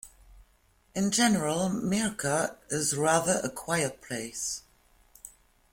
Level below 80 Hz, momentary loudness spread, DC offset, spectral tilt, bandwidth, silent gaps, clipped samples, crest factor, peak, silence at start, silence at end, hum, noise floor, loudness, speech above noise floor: -60 dBFS; 14 LU; under 0.1%; -3.5 dB/octave; 16.5 kHz; none; under 0.1%; 20 dB; -10 dBFS; 0.05 s; 0.45 s; none; -65 dBFS; -28 LUFS; 37 dB